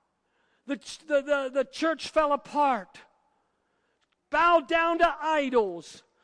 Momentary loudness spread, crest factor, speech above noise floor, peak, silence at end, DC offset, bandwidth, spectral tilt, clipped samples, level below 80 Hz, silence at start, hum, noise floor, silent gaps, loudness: 14 LU; 16 dB; 48 dB; -10 dBFS; 0.25 s; under 0.1%; 10.5 kHz; -3.5 dB/octave; under 0.1%; -58 dBFS; 0.7 s; none; -74 dBFS; none; -26 LUFS